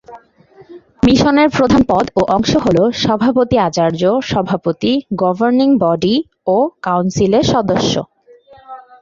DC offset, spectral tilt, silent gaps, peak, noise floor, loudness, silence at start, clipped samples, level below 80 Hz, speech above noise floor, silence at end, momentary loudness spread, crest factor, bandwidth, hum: under 0.1%; -6 dB/octave; none; 0 dBFS; -45 dBFS; -14 LUFS; 0.1 s; under 0.1%; -40 dBFS; 32 dB; 0.2 s; 5 LU; 14 dB; 7.6 kHz; none